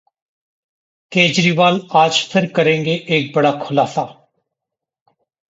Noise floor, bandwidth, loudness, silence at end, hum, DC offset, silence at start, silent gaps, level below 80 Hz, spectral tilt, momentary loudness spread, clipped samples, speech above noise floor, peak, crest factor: -84 dBFS; 8 kHz; -15 LUFS; 1.4 s; none; under 0.1%; 1.1 s; none; -62 dBFS; -4.5 dB/octave; 7 LU; under 0.1%; 68 dB; 0 dBFS; 18 dB